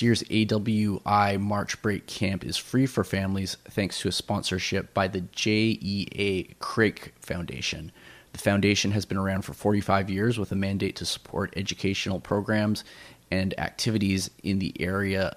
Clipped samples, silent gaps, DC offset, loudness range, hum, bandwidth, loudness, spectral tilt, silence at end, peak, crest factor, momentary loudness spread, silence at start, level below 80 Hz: under 0.1%; none; under 0.1%; 2 LU; none; 15.5 kHz; -27 LUFS; -5 dB/octave; 0.05 s; -8 dBFS; 20 dB; 7 LU; 0 s; -54 dBFS